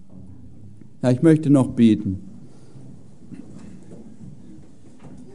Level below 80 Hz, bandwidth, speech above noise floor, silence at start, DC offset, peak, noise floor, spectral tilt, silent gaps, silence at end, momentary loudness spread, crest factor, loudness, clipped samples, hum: -58 dBFS; 11 kHz; 30 dB; 1.05 s; 1%; -4 dBFS; -47 dBFS; -8.5 dB/octave; none; 0.25 s; 27 LU; 20 dB; -18 LUFS; under 0.1%; none